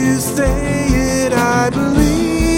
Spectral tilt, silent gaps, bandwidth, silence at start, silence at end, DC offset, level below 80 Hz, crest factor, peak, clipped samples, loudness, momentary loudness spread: -5 dB/octave; none; 17 kHz; 0 s; 0 s; under 0.1%; -24 dBFS; 14 dB; 0 dBFS; under 0.1%; -15 LUFS; 2 LU